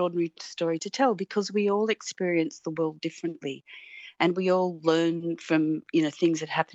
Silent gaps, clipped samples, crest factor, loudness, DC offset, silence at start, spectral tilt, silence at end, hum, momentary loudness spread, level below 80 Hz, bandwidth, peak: none; under 0.1%; 18 dB; -27 LUFS; under 0.1%; 0 s; -5.5 dB/octave; 0.1 s; none; 9 LU; -84 dBFS; 8.2 kHz; -8 dBFS